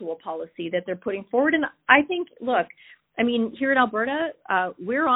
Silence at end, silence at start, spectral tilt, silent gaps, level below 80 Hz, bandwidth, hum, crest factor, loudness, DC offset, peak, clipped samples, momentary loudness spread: 0 s; 0 s; -9 dB/octave; none; -66 dBFS; 4 kHz; none; 22 dB; -24 LUFS; under 0.1%; -2 dBFS; under 0.1%; 14 LU